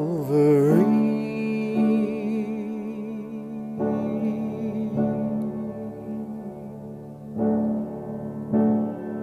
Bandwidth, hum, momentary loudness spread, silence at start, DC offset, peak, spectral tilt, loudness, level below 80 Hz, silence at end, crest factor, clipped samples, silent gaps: 13 kHz; none; 16 LU; 0 s; under 0.1%; -8 dBFS; -9.5 dB/octave; -25 LUFS; -60 dBFS; 0 s; 18 dB; under 0.1%; none